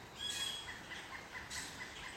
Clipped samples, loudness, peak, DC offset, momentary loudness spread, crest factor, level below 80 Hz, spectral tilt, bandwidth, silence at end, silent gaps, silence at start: under 0.1%; -43 LUFS; -30 dBFS; under 0.1%; 8 LU; 16 dB; -64 dBFS; -1 dB/octave; 16 kHz; 0 s; none; 0 s